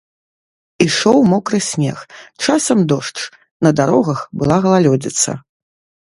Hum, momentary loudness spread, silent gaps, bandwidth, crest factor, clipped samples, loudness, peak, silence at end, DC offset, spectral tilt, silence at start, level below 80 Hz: none; 11 LU; 3.51-3.60 s; 11.5 kHz; 16 dB; under 0.1%; -15 LUFS; 0 dBFS; 0.65 s; under 0.1%; -5 dB/octave; 0.8 s; -50 dBFS